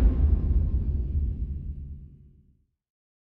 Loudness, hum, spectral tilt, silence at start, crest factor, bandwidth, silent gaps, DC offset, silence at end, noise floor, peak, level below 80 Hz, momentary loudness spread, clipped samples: -28 LUFS; none; -12.5 dB/octave; 0 s; 16 dB; 2 kHz; none; under 0.1%; 1.15 s; -64 dBFS; -10 dBFS; -28 dBFS; 16 LU; under 0.1%